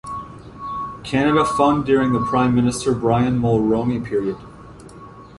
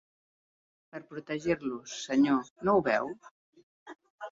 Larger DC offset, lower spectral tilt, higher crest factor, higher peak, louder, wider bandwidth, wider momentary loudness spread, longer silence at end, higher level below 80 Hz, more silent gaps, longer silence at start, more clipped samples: neither; first, -6.5 dB/octave vs -5 dB/octave; about the same, 16 dB vs 20 dB; first, -2 dBFS vs -14 dBFS; first, -19 LUFS vs -30 LUFS; first, 11.5 kHz vs 7.8 kHz; second, 15 LU vs 20 LU; about the same, 0 s vs 0 s; first, -44 dBFS vs -68 dBFS; second, none vs 2.50-2.56 s, 3.31-3.53 s, 3.63-3.86 s, 4.10-4.18 s; second, 0.05 s vs 0.95 s; neither